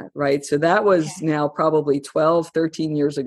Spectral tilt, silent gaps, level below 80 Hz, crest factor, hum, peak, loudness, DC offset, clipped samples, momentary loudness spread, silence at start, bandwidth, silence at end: -6 dB/octave; none; -64 dBFS; 16 dB; none; -4 dBFS; -20 LUFS; under 0.1%; under 0.1%; 6 LU; 0 s; 12.5 kHz; 0 s